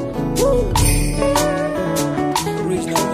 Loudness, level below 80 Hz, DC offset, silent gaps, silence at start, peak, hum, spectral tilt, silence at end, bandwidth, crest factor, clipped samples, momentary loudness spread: -18 LUFS; -26 dBFS; under 0.1%; none; 0 s; -2 dBFS; none; -4.5 dB/octave; 0 s; 15.5 kHz; 14 dB; under 0.1%; 4 LU